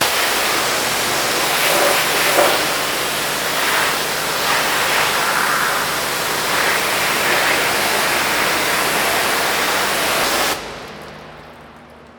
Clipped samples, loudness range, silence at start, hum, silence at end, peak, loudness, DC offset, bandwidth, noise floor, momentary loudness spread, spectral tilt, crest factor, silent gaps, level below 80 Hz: under 0.1%; 1 LU; 0 s; none; 0 s; 0 dBFS; -16 LUFS; under 0.1%; over 20 kHz; -41 dBFS; 4 LU; -1 dB/octave; 18 dB; none; -48 dBFS